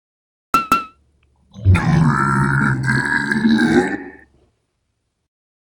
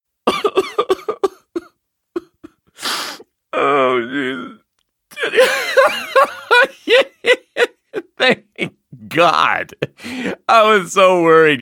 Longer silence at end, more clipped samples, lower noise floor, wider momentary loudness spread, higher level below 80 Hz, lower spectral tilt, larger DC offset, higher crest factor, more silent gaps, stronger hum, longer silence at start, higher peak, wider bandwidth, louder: first, 1.6 s vs 0 s; neither; about the same, -71 dBFS vs -68 dBFS; second, 8 LU vs 18 LU; first, -38 dBFS vs -64 dBFS; first, -6.5 dB/octave vs -3.5 dB/octave; neither; about the same, 18 dB vs 16 dB; neither; neither; first, 0.55 s vs 0.25 s; about the same, 0 dBFS vs 0 dBFS; about the same, 18 kHz vs 18.5 kHz; about the same, -16 LUFS vs -15 LUFS